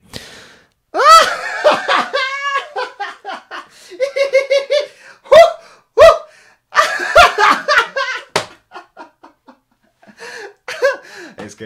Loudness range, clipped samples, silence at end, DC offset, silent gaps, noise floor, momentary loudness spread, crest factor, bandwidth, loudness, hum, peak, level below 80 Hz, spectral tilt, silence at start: 11 LU; 0.6%; 0 s; under 0.1%; none; -58 dBFS; 24 LU; 16 dB; 16.5 kHz; -12 LUFS; none; 0 dBFS; -44 dBFS; -1.5 dB/octave; 0.15 s